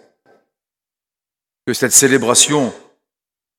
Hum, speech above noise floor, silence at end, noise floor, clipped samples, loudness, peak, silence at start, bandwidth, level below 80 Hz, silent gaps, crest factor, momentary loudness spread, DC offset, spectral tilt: none; 76 dB; 0.8 s; -89 dBFS; under 0.1%; -12 LUFS; 0 dBFS; 1.65 s; 19 kHz; -60 dBFS; none; 18 dB; 14 LU; under 0.1%; -2 dB/octave